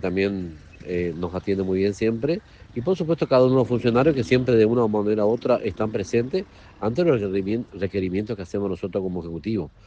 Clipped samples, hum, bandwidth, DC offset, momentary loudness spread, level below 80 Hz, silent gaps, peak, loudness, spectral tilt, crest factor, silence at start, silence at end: under 0.1%; none; 8.4 kHz; under 0.1%; 11 LU; -50 dBFS; none; -6 dBFS; -23 LUFS; -7.5 dB/octave; 18 dB; 0 s; 0.2 s